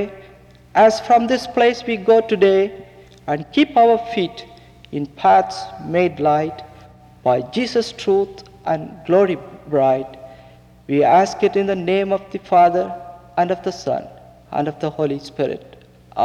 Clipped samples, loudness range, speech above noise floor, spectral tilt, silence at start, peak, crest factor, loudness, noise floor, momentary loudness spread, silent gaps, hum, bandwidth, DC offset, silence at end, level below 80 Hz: under 0.1%; 4 LU; 28 dB; -6 dB/octave; 0 s; -4 dBFS; 14 dB; -18 LUFS; -45 dBFS; 14 LU; none; none; 11 kHz; under 0.1%; 0 s; -54 dBFS